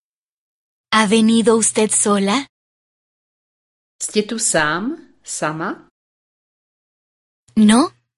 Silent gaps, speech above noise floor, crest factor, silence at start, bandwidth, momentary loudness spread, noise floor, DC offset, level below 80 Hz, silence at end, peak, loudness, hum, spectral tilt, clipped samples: 2.49-3.99 s, 5.91-7.47 s; over 74 dB; 18 dB; 0.9 s; 11.5 kHz; 14 LU; under -90 dBFS; under 0.1%; -58 dBFS; 0.3 s; -2 dBFS; -16 LUFS; none; -3.5 dB/octave; under 0.1%